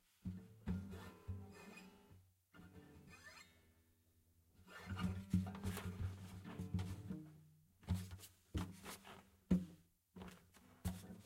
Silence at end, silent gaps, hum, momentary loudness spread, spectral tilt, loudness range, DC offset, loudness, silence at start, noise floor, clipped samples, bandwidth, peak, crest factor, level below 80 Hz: 0 s; none; none; 22 LU; -6.5 dB/octave; 12 LU; under 0.1%; -48 LUFS; 0.25 s; -75 dBFS; under 0.1%; 16 kHz; -22 dBFS; 26 dB; -60 dBFS